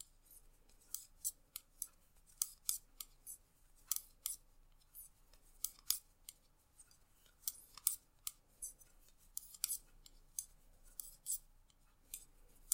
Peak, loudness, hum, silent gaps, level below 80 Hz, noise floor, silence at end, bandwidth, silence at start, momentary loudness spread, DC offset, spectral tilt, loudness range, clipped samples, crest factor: -10 dBFS; -45 LUFS; none; none; -68 dBFS; -70 dBFS; 0 s; 16.5 kHz; 0 s; 24 LU; under 0.1%; 2 dB/octave; 3 LU; under 0.1%; 40 dB